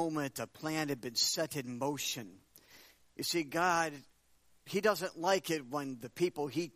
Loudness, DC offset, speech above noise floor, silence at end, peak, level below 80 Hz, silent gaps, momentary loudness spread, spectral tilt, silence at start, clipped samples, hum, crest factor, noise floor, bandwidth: -35 LUFS; under 0.1%; 33 dB; 0.05 s; -16 dBFS; -76 dBFS; none; 9 LU; -3 dB/octave; 0 s; under 0.1%; none; 22 dB; -68 dBFS; 15.5 kHz